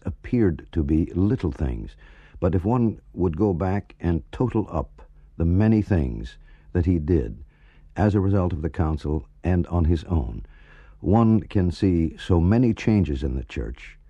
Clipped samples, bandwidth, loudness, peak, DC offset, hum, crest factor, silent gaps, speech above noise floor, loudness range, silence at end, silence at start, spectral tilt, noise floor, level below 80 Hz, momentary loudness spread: under 0.1%; 7.8 kHz; -23 LUFS; -6 dBFS; under 0.1%; none; 18 dB; none; 29 dB; 3 LU; 0.15 s; 0.05 s; -9.5 dB/octave; -51 dBFS; -34 dBFS; 12 LU